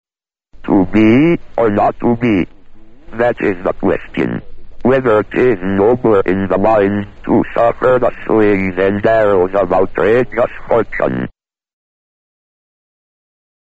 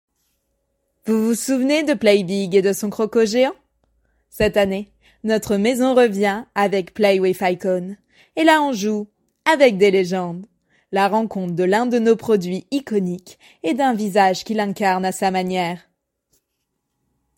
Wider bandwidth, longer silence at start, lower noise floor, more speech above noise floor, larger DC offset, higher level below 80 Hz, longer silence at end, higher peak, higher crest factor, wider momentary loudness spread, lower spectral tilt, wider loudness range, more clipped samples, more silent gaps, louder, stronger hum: second, 7.8 kHz vs 16.5 kHz; second, 0.55 s vs 1.05 s; second, -64 dBFS vs -75 dBFS; second, 51 dB vs 57 dB; neither; first, -36 dBFS vs -54 dBFS; first, 2.5 s vs 1.6 s; about the same, 0 dBFS vs -2 dBFS; about the same, 14 dB vs 18 dB; second, 7 LU vs 11 LU; first, -6.5 dB/octave vs -5 dB/octave; about the same, 4 LU vs 3 LU; neither; neither; first, -14 LUFS vs -19 LUFS; neither